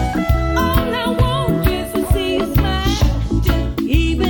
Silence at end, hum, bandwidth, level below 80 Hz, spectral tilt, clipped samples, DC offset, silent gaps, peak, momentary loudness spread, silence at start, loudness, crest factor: 0 s; none; 18 kHz; -20 dBFS; -6 dB/octave; under 0.1%; under 0.1%; none; -4 dBFS; 2 LU; 0 s; -18 LUFS; 12 dB